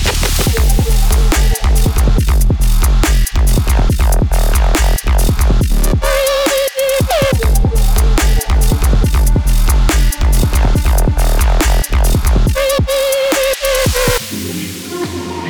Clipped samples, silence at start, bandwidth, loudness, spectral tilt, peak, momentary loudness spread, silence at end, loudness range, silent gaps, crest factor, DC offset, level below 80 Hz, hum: under 0.1%; 0 s; over 20 kHz; -14 LUFS; -4.5 dB/octave; -4 dBFS; 2 LU; 0 s; 0 LU; none; 6 dB; under 0.1%; -12 dBFS; none